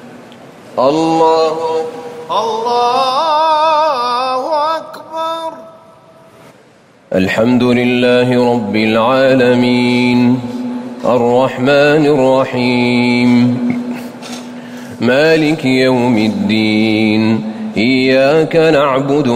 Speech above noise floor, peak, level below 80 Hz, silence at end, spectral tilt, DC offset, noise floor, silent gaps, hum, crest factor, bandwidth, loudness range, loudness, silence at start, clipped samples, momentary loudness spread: 34 dB; -2 dBFS; -52 dBFS; 0 s; -6 dB/octave; under 0.1%; -45 dBFS; none; none; 12 dB; 15 kHz; 4 LU; -12 LUFS; 0 s; under 0.1%; 11 LU